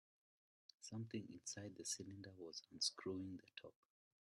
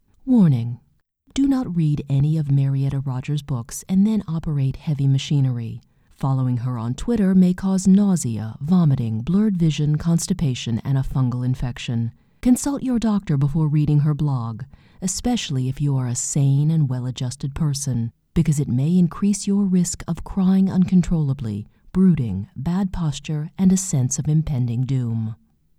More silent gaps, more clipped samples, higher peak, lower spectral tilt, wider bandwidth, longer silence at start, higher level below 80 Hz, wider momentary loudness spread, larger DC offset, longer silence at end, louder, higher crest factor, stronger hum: neither; neither; second, -28 dBFS vs -6 dBFS; second, -3 dB/octave vs -6.5 dB/octave; about the same, 12.5 kHz vs 13.5 kHz; first, 0.8 s vs 0.25 s; second, -88 dBFS vs -40 dBFS; first, 16 LU vs 9 LU; neither; about the same, 0.5 s vs 0.45 s; second, -49 LUFS vs -21 LUFS; first, 24 dB vs 14 dB; neither